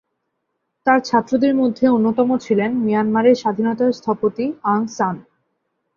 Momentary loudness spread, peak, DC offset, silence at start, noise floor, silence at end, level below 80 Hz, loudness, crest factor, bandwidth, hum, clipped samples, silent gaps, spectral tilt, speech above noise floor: 7 LU; -2 dBFS; under 0.1%; 0.85 s; -74 dBFS; 0.75 s; -62 dBFS; -18 LUFS; 16 dB; 7.2 kHz; none; under 0.1%; none; -6.5 dB/octave; 57 dB